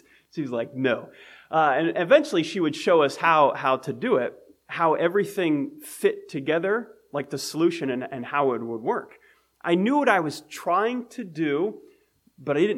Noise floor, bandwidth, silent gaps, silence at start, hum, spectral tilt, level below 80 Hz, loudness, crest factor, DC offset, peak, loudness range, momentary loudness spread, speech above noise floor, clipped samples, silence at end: -61 dBFS; 15.5 kHz; none; 0.35 s; none; -5.5 dB/octave; -76 dBFS; -24 LUFS; 20 dB; under 0.1%; -6 dBFS; 5 LU; 12 LU; 37 dB; under 0.1%; 0 s